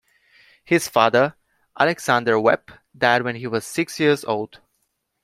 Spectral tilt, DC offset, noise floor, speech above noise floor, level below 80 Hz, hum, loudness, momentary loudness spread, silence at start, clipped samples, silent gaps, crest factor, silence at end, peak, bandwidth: -4.5 dB/octave; under 0.1%; -72 dBFS; 52 dB; -64 dBFS; none; -20 LUFS; 9 LU; 0.7 s; under 0.1%; none; 20 dB; 0.65 s; 0 dBFS; 16 kHz